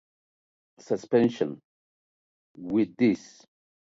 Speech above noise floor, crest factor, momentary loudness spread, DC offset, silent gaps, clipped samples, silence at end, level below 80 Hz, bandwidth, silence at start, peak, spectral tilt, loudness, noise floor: over 64 dB; 20 dB; 12 LU; under 0.1%; 1.64-2.55 s; under 0.1%; 0.65 s; -70 dBFS; 7.8 kHz; 0.9 s; -8 dBFS; -7 dB/octave; -27 LUFS; under -90 dBFS